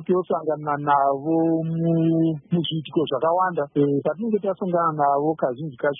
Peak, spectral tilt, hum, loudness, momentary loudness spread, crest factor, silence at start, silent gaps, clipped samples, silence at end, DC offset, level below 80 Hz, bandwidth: -8 dBFS; -12 dB/octave; none; -22 LUFS; 5 LU; 14 dB; 0 s; none; under 0.1%; 0 s; under 0.1%; -68 dBFS; 3.8 kHz